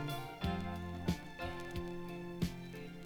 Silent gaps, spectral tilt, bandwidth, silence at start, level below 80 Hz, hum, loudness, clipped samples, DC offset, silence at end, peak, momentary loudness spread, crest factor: none; -6 dB/octave; over 20 kHz; 0 s; -54 dBFS; none; -42 LUFS; under 0.1%; under 0.1%; 0 s; -22 dBFS; 6 LU; 20 dB